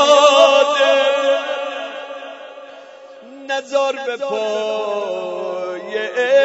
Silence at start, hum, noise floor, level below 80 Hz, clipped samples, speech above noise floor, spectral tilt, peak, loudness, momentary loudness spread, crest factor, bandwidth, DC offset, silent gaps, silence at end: 0 s; none; -39 dBFS; -76 dBFS; under 0.1%; 18 dB; -1 dB/octave; 0 dBFS; -17 LUFS; 22 LU; 18 dB; 8 kHz; under 0.1%; none; 0 s